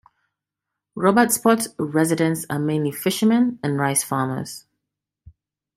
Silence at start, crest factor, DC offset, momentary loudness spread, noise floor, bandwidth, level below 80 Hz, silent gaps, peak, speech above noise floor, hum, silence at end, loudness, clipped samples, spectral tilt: 0.95 s; 20 dB; under 0.1%; 10 LU; -84 dBFS; 16 kHz; -62 dBFS; none; -2 dBFS; 64 dB; none; 1.15 s; -20 LUFS; under 0.1%; -5 dB/octave